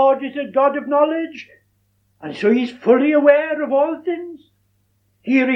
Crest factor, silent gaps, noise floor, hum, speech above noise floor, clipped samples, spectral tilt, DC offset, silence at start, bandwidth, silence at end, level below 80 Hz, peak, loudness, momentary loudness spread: 18 dB; none; -63 dBFS; none; 46 dB; under 0.1%; -6.5 dB/octave; under 0.1%; 0 s; 6.2 kHz; 0 s; -72 dBFS; -2 dBFS; -17 LUFS; 19 LU